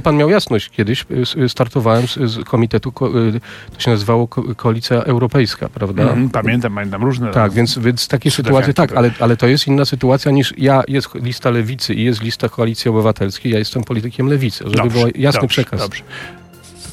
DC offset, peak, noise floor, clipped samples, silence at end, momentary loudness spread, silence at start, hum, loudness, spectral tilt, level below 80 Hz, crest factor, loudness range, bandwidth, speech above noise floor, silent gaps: under 0.1%; -2 dBFS; -37 dBFS; under 0.1%; 0 s; 7 LU; 0 s; none; -15 LUFS; -6 dB/octave; -44 dBFS; 14 dB; 3 LU; 14.5 kHz; 22 dB; none